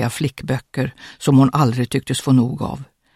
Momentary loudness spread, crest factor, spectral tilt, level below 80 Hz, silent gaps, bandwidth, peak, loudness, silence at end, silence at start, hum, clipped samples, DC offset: 12 LU; 16 dB; -6.5 dB/octave; -48 dBFS; none; 15 kHz; -2 dBFS; -19 LUFS; 0.3 s; 0 s; none; under 0.1%; under 0.1%